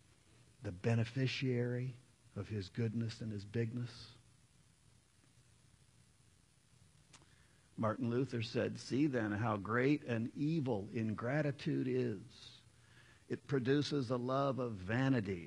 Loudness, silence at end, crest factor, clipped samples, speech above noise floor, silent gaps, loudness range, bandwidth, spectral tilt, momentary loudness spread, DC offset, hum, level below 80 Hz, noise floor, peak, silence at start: -38 LUFS; 0 s; 20 dB; under 0.1%; 32 dB; none; 9 LU; 11 kHz; -7 dB/octave; 14 LU; under 0.1%; none; -74 dBFS; -70 dBFS; -20 dBFS; 0.6 s